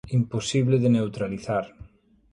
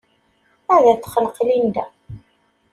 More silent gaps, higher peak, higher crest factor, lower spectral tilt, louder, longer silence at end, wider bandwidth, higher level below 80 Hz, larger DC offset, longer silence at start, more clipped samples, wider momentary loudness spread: neither; second, -10 dBFS vs -2 dBFS; about the same, 14 dB vs 18 dB; about the same, -6.5 dB/octave vs -6 dB/octave; second, -24 LUFS vs -17 LUFS; about the same, 0.5 s vs 0.55 s; second, 11 kHz vs 14 kHz; about the same, -54 dBFS vs -56 dBFS; neither; second, 0.05 s vs 0.7 s; neither; second, 9 LU vs 17 LU